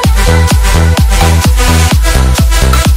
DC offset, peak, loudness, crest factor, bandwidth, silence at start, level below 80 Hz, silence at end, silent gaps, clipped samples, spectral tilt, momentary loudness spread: under 0.1%; 0 dBFS; -8 LUFS; 6 dB; 16.5 kHz; 0 s; -8 dBFS; 0 s; none; 0.5%; -4.5 dB/octave; 1 LU